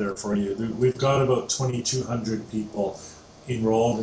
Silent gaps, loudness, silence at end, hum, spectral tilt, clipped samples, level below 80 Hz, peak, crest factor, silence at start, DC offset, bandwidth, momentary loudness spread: none; -25 LUFS; 0 s; none; -5.5 dB/octave; under 0.1%; -52 dBFS; -10 dBFS; 14 dB; 0 s; under 0.1%; 8 kHz; 10 LU